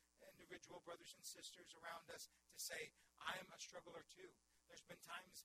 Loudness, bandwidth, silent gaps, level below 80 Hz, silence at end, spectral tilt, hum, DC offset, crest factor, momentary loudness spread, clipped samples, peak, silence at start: -56 LUFS; 16 kHz; none; -88 dBFS; 0 s; -1 dB/octave; none; under 0.1%; 26 dB; 14 LU; under 0.1%; -32 dBFS; 0 s